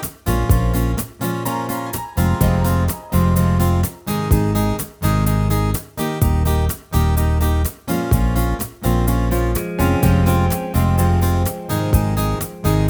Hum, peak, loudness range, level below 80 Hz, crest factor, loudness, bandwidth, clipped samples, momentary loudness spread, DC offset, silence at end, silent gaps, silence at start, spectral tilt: none; -2 dBFS; 1 LU; -24 dBFS; 16 dB; -19 LUFS; over 20 kHz; under 0.1%; 6 LU; under 0.1%; 0 s; none; 0 s; -6.5 dB/octave